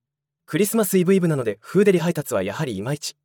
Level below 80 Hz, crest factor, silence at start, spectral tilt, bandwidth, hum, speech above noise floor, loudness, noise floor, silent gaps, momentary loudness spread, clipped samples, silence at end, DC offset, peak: -68 dBFS; 16 dB; 0.5 s; -5.5 dB/octave; 18 kHz; none; 39 dB; -21 LUFS; -59 dBFS; none; 9 LU; under 0.1%; 0.15 s; under 0.1%; -6 dBFS